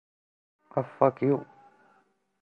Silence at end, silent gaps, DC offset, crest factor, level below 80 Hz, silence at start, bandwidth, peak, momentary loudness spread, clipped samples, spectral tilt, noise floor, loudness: 1 s; none; under 0.1%; 24 dB; -76 dBFS; 0.75 s; 4.8 kHz; -6 dBFS; 9 LU; under 0.1%; -11 dB/octave; -68 dBFS; -28 LUFS